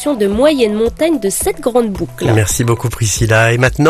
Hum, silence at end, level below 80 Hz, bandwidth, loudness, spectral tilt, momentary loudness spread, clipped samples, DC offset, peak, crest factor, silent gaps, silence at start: none; 0 s; -32 dBFS; 14.5 kHz; -13 LUFS; -5 dB/octave; 5 LU; under 0.1%; under 0.1%; 0 dBFS; 12 dB; none; 0 s